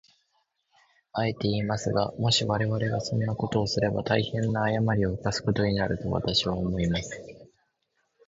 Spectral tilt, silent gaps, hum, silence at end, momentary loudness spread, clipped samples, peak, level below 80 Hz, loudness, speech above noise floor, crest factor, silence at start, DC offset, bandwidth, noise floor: -5.5 dB/octave; none; none; 0.8 s; 5 LU; under 0.1%; -8 dBFS; -48 dBFS; -27 LUFS; 49 dB; 20 dB; 1.15 s; under 0.1%; 8 kHz; -75 dBFS